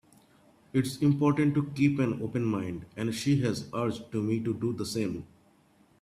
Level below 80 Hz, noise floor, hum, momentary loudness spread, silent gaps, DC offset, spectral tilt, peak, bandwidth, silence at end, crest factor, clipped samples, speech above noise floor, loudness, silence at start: -62 dBFS; -63 dBFS; none; 9 LU; none; under 0.1%; -6.5 dB/octave; -12 dBFS; 14.5 kHz; 0.75 s; 18 dB; under 0.1%; 35 dB; -29 LUFS; 0.75 s